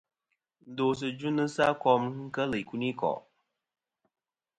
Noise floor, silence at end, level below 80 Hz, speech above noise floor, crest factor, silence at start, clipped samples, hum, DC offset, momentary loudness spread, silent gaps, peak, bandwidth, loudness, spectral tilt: -82 dBFS; 1.4 s; -66 dBFS; 53 dB; 22 dB; 0.65 s; under 0.1%; none; under 0.1%; 8 LU; none; -10 dBFS; 11 kHz; -30 LUFS; -6 dB/octave